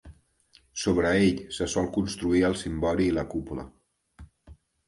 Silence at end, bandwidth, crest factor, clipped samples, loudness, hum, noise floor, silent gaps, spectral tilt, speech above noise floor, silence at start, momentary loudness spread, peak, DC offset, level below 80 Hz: 0.35 s; 11.5 kHz; 16 dB; under 0.1%; -26 LUFS; none; -62 dBFS; none; -5.5 dB/octave; 36 dB; 0.05 s; 14 LU; -10 dBFS; under 0.1%; -46 dBFS